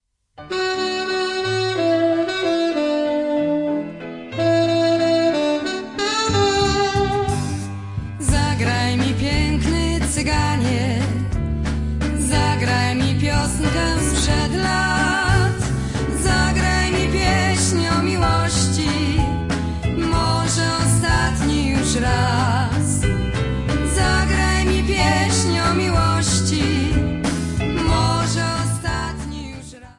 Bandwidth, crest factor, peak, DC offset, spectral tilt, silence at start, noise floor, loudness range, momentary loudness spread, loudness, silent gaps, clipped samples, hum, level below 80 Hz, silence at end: 11.5 kHz; 16 dB; -2 dBFS; under 0.1%; -5 dB/octave; 0.4 s; -43 dBFS; 2 LU; 6 LU; -19 LUFS; none; under 0.1%; none; -28 dBFS; 0.05 s